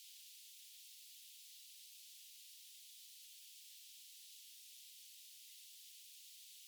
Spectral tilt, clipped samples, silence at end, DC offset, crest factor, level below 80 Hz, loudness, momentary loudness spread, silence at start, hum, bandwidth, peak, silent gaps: 7.5 dB/octave; under 0.1%; 0 s; under 0.1%; 14 dB; under -90 dBFS; -56 LUFS; 0 LU; 0 s; none; over 20 kHz; -46 dBFS; none